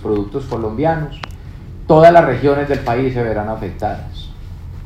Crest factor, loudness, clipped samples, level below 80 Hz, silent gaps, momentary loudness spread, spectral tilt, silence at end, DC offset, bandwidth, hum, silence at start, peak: 16 dB; -15 LUFS; 0.4%; -34 dBFS; none; 24 LU; -8 dB/octave; 0 s; under 0.1%; 9.2 kHz; none; 0 s; 0 dBFS